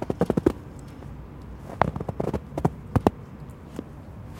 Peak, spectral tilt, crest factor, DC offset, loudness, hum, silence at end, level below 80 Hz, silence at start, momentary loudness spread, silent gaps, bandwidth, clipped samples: 0 dBFS; -8 dB/octave; 28 dB; under 0.1%; -27 LUFS; none; 0 s; -42 dBFS; 0 s; 17 LU; none; 17 kHz; under 0.1%